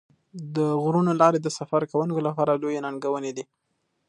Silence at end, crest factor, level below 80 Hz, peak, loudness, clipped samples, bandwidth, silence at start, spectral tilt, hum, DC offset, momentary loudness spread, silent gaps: 0.65 s; 20 dB; -74 dBFS; -4 dBFS; -24 LUFS; under 0.1%; 11 kHz; 0.35 s; -7 dB/octave; none; under 0.1%; 16 LU; none